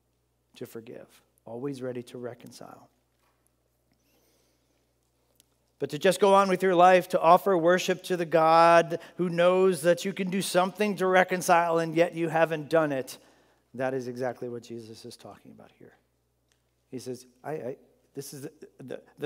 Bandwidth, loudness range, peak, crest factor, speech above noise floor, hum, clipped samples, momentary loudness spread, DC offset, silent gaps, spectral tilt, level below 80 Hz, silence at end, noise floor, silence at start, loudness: 16 kHz; 20 LU; -4 dBFS; 22 dB; 47 dB; none; under 0.1%; 23 LU; under 0.1%; none; -5 dB/octave; -78 dBFS; 0 s; -73 dBFS; 0.6 s; -24 LUFS